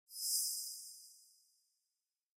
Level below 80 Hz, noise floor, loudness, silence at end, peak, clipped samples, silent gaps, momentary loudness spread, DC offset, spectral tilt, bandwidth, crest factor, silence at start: under -90 dBFS; under -90 dBFS; -38 LUFS; 1.15 s; -22 dBFS; under 0.1%; none; 21 LU; under 0.1%; 9 dB/octave; 16 kHz; 22 dB; 0.1 s